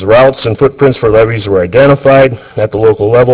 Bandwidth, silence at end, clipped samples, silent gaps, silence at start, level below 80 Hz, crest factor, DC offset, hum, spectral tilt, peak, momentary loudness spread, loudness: 4 kHz; 0 s; 2%; none; 0 s; -32 dBFS; 8 dB; under 0.1%; none; -11 dB/octave; 0 dBFS; 5 LU; -8 LUFS